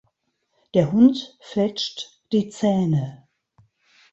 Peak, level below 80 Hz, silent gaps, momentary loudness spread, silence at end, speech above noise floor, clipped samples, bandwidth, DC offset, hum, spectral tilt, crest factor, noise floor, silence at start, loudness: -4 dBFS; -62 dBFS; none; 13 LU; 1 s; 52 dB; under 0.1%; 8 kHz; under 0.1%; none; -7 dB/octave; 18 dB; -72 dBFS; 0.75 s; -21 LUFS